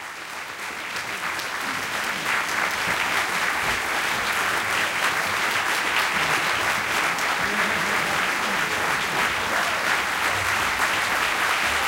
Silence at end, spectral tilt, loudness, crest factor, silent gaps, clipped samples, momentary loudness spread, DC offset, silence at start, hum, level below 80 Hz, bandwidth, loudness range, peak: 0 s; -1.5 dB/octave; -22 LUFS; 16 dB; none; under 0.1%; 6 LU; under 0.1%; 0 s; none; -54 dBFS; 17 kHz; 2 LU; -8 dBFS